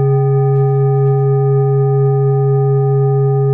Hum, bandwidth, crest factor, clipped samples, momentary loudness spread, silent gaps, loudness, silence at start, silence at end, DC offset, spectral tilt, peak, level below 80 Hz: none; 2.4 kHz; 6 dB; under 0.1%; 0 LU; none; -13 LUFS; 0 s; 0 s; under 0.1%; -14.5 dB/octave; -6 dBFS; -54 dBFS